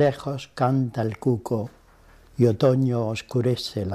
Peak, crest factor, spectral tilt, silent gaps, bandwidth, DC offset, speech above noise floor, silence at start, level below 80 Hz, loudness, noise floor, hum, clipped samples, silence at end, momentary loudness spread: -8 dBFS; 16 dB; -7.5 dB/octave; none; 13.5 kHz; under 0.1%; 30 dB; 0 s; -56 dBFS; -24 LUFS; -52 dBFS; none; under 0.1%; 0 s; 11 LU